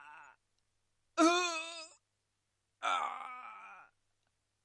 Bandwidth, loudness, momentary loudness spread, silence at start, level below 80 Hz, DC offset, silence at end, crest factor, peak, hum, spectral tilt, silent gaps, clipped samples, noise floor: 11.5 kHz; -34 LUFS; 24 LU; 0 s; -90 dBFS; under 0.1%; 0.8 s; 22 dB; -16 dBFS; none; -0.5 dB/octave; none; under 0.1%; -84 dBFS